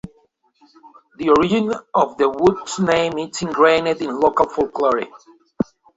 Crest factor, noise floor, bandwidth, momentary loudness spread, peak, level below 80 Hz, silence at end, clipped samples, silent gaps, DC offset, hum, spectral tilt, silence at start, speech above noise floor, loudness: 18 dB; -60 dBFS; 8 kHz; 10 LU; -2 dBFS; -52 dBFS; 0.35 s; under 0.1%; none; under 0.1%; none; -5 dB/octave; 0.05 s; 42 dB; -18 LUFS